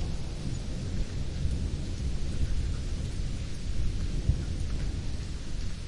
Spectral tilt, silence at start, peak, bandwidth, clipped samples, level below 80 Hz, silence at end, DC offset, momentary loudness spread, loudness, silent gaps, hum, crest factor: -6 dB/octave; 0 s; -14 dBFS; 11 kHz; under 0.1%; -34 dBFS; 0 s; under 0.1%; 5 LU; -35 LUFS; none; none; 16 dB